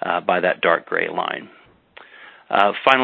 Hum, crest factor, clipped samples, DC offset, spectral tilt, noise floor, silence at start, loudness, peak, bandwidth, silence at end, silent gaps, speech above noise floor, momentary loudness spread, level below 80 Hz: none; 20 dB; under 0.1%; under 0.1%; -5.5 dB/octave; -48 dBFS; 0 s; -19 LUFS; 0 dBFS; 8 kHz; 0 s; none; 29 dB; 9 LU; -66 dBFS